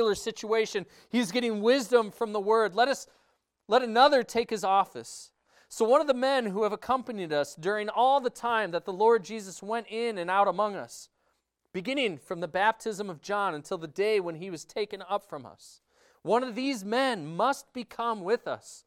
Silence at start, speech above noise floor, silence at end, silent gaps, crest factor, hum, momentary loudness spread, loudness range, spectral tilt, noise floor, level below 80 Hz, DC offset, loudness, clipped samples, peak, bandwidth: 0 s; 48 dB; 0.1 s; none; 22 dB; none; 13 LU; 6 LU; -4 dB/octave; -76 dBFS; -72 dBFS; under 0.1%; -28 LUFS; under 0.1%; -6 dBFS; 15.5 kHz